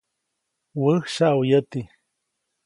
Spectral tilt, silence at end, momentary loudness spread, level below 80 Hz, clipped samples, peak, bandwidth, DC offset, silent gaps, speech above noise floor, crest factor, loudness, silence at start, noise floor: -6.5 dB/octave; 0.8 s; 16 LU; -66 dBFS; under 0.1%; -6 dBFS; 11.5 kHz; under 0.1%; none; 58 dB; 18 dB; -21 LUFS; 0.75 s; -79 dBFS